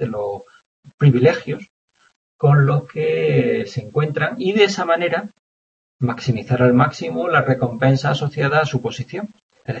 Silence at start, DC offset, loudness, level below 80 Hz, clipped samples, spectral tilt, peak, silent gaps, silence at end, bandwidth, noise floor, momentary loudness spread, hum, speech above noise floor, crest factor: 0 s; under 0.1%; -18 LUFS; -56 dBFS; under 0.1%; -7 dB/octave; -2 dBFS; 0.66-0.83 s, 0.94-0.98 s, 1.70-1.88 s, 2.16-2.39 s, 5.39-5.99 s, 9.43-9.49 s; 0 s; 7.6 kHz; under -90 dBFS; 14 LU; none; over 72 dB; 18 dB